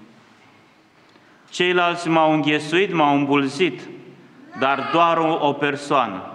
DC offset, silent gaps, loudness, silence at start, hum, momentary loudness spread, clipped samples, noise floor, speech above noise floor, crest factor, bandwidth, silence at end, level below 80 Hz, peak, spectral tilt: under 0.1%; none; -19 LUFS; 0 s; none; 6 LU; under 0.1%; -53 dBFS; 34 dB; 18 dB; 10.5 kHz; 0 s; -74 dBFS; -2 dBFS; -5 dB/octave